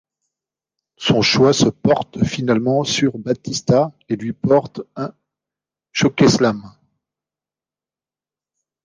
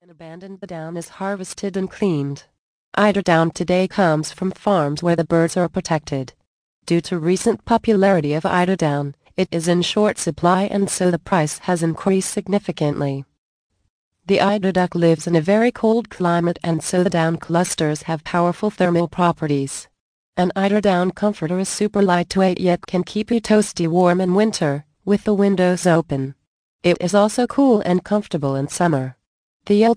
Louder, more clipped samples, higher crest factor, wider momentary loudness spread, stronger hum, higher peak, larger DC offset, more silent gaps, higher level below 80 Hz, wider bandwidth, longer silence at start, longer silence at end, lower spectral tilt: about the same, -17 LUFS vs -19 LUFS; neither; about the same, 18 dB vs 18 dB; first, 14 LU vs 10 LU; neither; about the same, -2 dBFS vs -2 dBFS; neither; second, none vs 2.58-2.92 s, 6.47-6.82 s, 13.38-13.70 s, 13.89-14.12 s, 20.00-20.33 s, 26.47-26.79 s, 29.26-29.60 s; about the same, -50 dBFS vs -52 dBFS; about the same, 10 kHz vs 10.5 kHz; first, 1 s vs 0.2 s; first, 2.15 s vs 0 s; about the same, -5 dB/octave vs -6 dB/octave